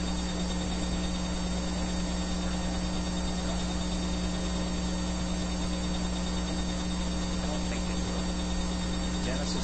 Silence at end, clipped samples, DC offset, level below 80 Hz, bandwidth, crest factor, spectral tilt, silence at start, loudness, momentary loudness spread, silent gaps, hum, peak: 0 s; under 0.1%; under 0.1%; -36 dBFS; 8.8 kHz; 12 dB; -4.5 dB/octave; 0 s; -32 LUFS; 0 LU; none; none; -18 dBFS